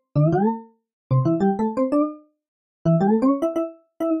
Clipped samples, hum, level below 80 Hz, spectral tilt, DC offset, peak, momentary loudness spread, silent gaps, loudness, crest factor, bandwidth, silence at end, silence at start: under 0.1%; none; -56 dBFS; -10.5 dB/octave; under 0.1%; -8 dBFS; 9 LU; 0.93-1.10 s, 2.48-2.85 s; -22 LUFS; 12 dB; 9.4 kHz; 0 s; 0.15 s